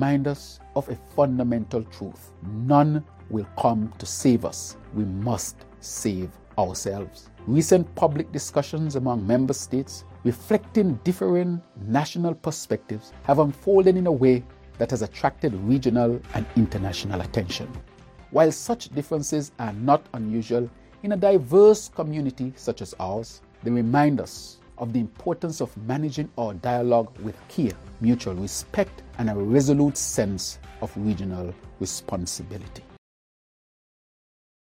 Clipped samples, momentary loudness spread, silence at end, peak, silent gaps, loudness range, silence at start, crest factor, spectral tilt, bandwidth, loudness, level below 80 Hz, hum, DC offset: under 0.1%; 14 LU; 1.9 s; -4 dBFS; none; 5 LU; 0 s; 20 dB; -6 dB/octave; 16.5 kHz; -24 LUFS; -50 dBFS; none; under 0.1%